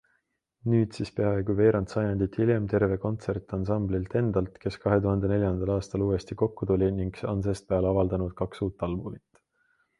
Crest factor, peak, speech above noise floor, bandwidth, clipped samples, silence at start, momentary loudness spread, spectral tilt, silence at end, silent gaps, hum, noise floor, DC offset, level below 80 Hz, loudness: 18 dB; -8 dBFS; 48 dB; 11 kHz; under 0.1%; 0.65 s; 7 LU; -8.5 dB/octave; 0.8 s; none; none; -75 dBFS; under 0.1%; -44 dBFS; -28 LUFS